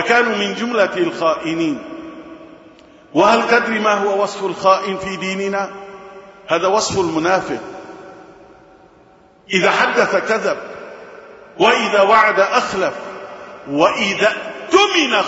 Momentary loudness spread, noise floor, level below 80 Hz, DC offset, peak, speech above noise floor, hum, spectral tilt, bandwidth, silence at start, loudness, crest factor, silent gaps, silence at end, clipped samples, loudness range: 21 LU; -48 dBFS; -56 dBFS; under 0.1%; 0 dBFS; 32 dB; none; -3.5 dB/octave; 8 kHz; 0 s; -16 LUFS; 18 dB; none; 0 s; under 0.1%; 5 LU